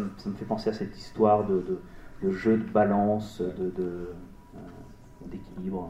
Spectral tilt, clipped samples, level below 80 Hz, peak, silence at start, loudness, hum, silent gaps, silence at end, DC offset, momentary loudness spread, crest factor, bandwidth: -8 dB/octave; under 0.1%; -52 dBFS; -8 dBFS; 0 s; -28 LUFS; none; none; 0 s; under 0.1%; 23 LU; 20 dB; 10 kHz